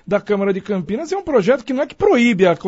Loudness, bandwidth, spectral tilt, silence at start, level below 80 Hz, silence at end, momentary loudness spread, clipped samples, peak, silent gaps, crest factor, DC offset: -17 LUFS; 8 kHz; -6.5 dB/octave; 0.05 s; -50 dBFS; 0 s; 9 LU; under 0.1%; -2 dBFS; none; 16 dB; under 0.1%